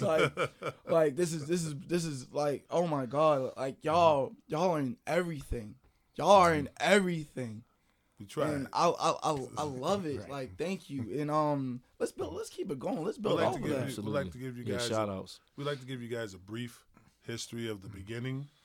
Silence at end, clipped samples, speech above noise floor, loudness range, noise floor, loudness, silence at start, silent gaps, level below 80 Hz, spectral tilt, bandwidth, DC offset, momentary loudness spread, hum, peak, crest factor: 0.15 s; under 0.1%; 40 dB; 8 LU; -72 dBFS; -32 LUFS; 0 s; none; -58 dBFS; -5.5 dB/octave; 16.5 kHz; under 0.1%; 15 LU; none; -8 dBFS; 24 dB